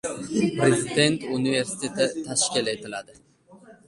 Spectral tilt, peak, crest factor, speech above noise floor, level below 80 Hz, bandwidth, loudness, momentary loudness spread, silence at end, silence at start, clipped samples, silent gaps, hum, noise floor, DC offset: -3.5 dB/octave; -4 dBFS; 22 dB; 27 dB; -62 dBFS; 11.5 kHz; -24 LUFS; 8 LU; 0.15 s; 0.05 s; under 0.1%; none; none; -51 dBFS; under 0.1%